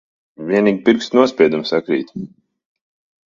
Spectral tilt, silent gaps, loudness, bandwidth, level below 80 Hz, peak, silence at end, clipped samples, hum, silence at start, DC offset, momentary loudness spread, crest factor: -6 dB/octave; none; -16 LUFS; 7.4 kHz; -60 dBFS; 0 dBFS; 1 s; under 0.1%; none; 0.4 s; under 0.1%; 17 LU; 18 dB